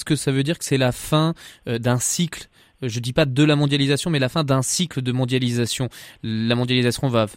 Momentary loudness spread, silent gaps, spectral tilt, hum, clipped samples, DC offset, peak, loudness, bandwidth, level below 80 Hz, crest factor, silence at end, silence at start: 10 LU; none; -5 dB/octave; none; under 0.1%; under 0.1%; -4 dBFS; -21 LUFS; 16 kHz; -50 dBFS; 16 dB; 0 s; 0 s